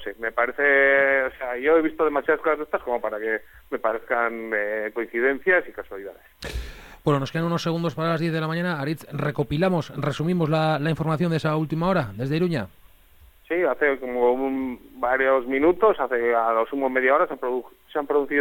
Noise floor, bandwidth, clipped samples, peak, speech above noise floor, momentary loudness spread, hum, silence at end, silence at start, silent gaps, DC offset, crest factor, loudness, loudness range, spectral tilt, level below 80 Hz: -52 dBFS; 17.5 kHz; under 0.1%; -8 dBFS; 29 dB; 10 LU; none; 0 s; 0 s; none; under 0.1%; 16 dB; -23 LUFS; 4 LU; -7 dB/octave; -48 dBFS